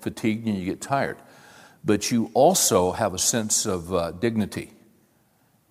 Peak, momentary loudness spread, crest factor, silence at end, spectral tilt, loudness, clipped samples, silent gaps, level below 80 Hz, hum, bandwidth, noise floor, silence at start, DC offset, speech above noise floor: -6 dBFS; 12 LU; 18 dB; 1.05 s; -3.5 dB/octave; -23 LUFS; under 0.1%; none; -56 dBFS; none; 16.5 kHz; -63 dBFS; 0 s; under 0.1%; 40 dB